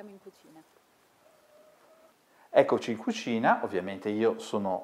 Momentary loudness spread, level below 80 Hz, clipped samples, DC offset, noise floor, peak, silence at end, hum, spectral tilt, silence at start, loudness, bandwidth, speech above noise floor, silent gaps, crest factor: 9 LU; -82 dBFS; under 0.1%; under 0.1%; -62 dBFS; -8 dBFS; 0 s; none; -5.5 dB/octave; 0 s; -28 LUFS; 14.5 kHz; 33 dB; none; 24 dB